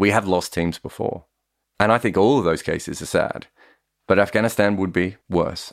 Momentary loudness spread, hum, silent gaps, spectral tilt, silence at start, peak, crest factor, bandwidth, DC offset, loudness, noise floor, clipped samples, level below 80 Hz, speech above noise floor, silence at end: 10 LU; none; none; -5.5 dB/octave; 0 s; -2 dBFS; 18 dB; 16 kHz; under 0.1%; -21 LUFS; -57 dBFS; under 0.1%; -48 dBFS; 36 dB; 0 s